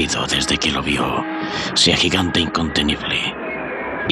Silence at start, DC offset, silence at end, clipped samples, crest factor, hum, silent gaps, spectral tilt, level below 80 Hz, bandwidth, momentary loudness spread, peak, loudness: 0 s; under 0.1%; 0 s; under 0.1%; 16 dB; none; none; -3 dB/octave; -40 dBFS; 13.5 kHz; 10 LU; -2 dBFS; -18 LUFS